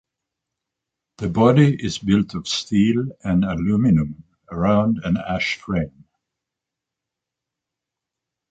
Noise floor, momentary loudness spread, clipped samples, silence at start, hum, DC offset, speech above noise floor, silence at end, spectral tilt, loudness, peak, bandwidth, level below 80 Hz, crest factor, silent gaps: -85 dBFS; 9 LU; under 0.1%; 1.2 s; none; under 0.1%; 66 dB; 2.65 s; -6.5 dB/octave; -20 LUFS; -2 dBFS; 8.8 kHz; -44 dBFS; 20 dB; none